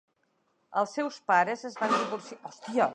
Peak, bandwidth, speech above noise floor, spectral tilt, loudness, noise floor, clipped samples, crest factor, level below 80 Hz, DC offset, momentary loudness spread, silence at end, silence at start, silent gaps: -10 dBFS; 10.5 kHz; 45 dB; -4 dB/octave; -29 LUFS; -73 dBFS; under 0.1%; 20 dB; -86 dBFS; under 0.1%; 13 LU; 0 s; 0.7 s; none